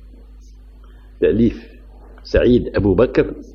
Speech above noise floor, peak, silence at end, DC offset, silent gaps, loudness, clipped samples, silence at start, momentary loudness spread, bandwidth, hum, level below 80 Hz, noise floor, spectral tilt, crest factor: 25 dB; 0 dBFS; 0.1 s; under 0.1%; none; -17 LUFS; under 0.1%; 1.2 s; 6 LU; 6.8 kHz; none; -32 dBFS; -41 dBFS; -8.5 dB/octave; 18 dB